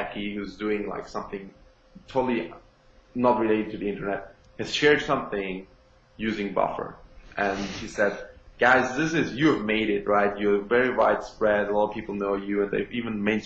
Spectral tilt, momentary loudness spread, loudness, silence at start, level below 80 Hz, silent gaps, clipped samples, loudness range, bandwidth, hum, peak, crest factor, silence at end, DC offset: -5.5 dB/octave; 14 LU; -25 LUFS; 0 s; -52 dBFS; none; under 0.1%; 6 LU; 8 kHz; none; -6 dBFS; 20 dB; 0 s; under 0.1%